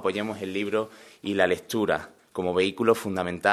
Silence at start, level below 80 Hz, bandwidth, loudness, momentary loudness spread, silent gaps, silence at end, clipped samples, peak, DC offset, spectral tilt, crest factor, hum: 0 s; -62 dBFS; 14 kHz; -26 LUFS; 8 LU; none; 0 s; under 0.1%; -4 dBFS; under 0.1%; -5 dB/octave; 22 dB; none